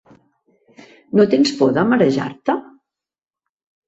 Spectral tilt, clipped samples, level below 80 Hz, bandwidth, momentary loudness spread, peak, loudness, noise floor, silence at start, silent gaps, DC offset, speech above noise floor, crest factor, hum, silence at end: -6 dB/octave; under 0.1%; -60 dBFS; 8 kHz; 8 LU; -2 dBFS; -17 LUFS; -62 dBFS; 1.15 s; none; under 0.1%; 47 dB; 18 dB; none; 1.25 s